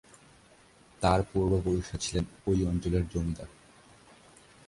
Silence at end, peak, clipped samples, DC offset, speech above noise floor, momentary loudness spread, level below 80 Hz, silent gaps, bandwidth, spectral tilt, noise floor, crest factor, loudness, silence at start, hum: 1.2 s; -12 dBFS; under 0.1%; under 0.1%; 30 dB; 7 LU; -42 dBFS; none; 11.5 kHz; -6 dB/octave; -59 dBFS; 20 dB; -30 LUFS; 1 s; none